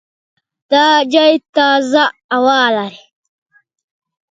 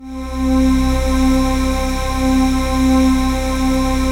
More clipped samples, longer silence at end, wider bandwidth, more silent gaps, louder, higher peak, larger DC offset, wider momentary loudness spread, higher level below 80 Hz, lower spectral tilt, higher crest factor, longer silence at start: neither; first, 1.35 s vs 0 s; second, 9.2 kHz vs 16.5 kHz; first, 1.49-1.53 s, 2.24-2.29 s vs none; first, -12 LUFS vs -16 LUFS; first, 0 dBFS vs -4 dBFS; neither; about the same, 5 LU vs 5 LU; second, -66 dBFS vs -20 dBFS; second, -3 dB/octave vs -5.5 dB/octave; about the same, 14 dB vs 12 dB; first, 0.7 s vs 0 s